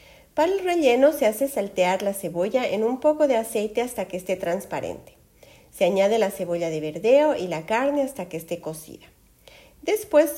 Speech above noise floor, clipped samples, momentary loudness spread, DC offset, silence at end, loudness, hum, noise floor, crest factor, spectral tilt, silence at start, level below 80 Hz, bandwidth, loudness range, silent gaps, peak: 30 dB; under 0.1%; 13 LU; under 0.1%; 0 s; -23 LUFS; none; -52 dBFS; 18 dB; -4.5 dB/octave; 0.35 s; -60 dBFS; 16.5 kHz; 4 LU; none; -6 dBFS